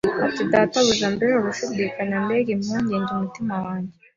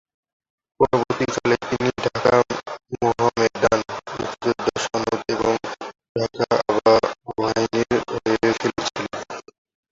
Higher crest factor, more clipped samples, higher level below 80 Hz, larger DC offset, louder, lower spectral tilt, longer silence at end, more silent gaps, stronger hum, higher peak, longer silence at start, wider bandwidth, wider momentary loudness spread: about the same, 18 dB vs 20 dB; neither; about the same, -56 dBFS vs -52 dBFS; neither; about the same, -22 LUFS vs -22 LUFS; about the same, -4.5 dB/octave vs -5 dB/octave; second, 0.25 s vs 0.5 s; second, none vs 6.09-6.15 s; neither; about the same, -4 dBFS vs -2 dBFS; second, 0.05 s vs 0.8 s; about the same, 7.6 kHz vs 8 kHz; second, 8 LU vs 12 LU